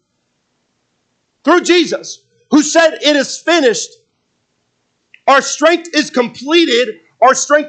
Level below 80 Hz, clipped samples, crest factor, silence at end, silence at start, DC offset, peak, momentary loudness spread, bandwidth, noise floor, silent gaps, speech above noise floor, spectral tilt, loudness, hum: -68 dBFS; under 0.1%; 14 dB; 0 s; 1.45 s; under 0.1%; 0 dBFS; 10 LU; 9.2 kHz; -66 dBFS; none; 54 dB; -2 dB/octave; -12 LUFS; none